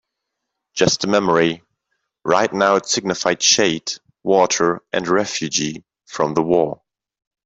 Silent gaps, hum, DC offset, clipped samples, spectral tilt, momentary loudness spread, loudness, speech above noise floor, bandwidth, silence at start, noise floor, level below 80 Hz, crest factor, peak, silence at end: none; none; under 0.1%; under 0.1%; -3 dB/octave; 13 LU; -18 LUFS; 61 dB; 8 kHz; 0.75 s; -79 dBFS; -58 dBFS; 18 dB; -2 dBFS; 0.7 s